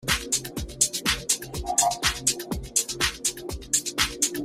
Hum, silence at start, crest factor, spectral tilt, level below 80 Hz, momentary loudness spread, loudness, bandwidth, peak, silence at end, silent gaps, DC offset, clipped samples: none; 0 s; 22 dB; -1 dB/octave; -42 dBFS; 6 LU; -24 LUFS; 16 kHz; -4 dBFS; 0 s; none; under 0.1%; under 0.1%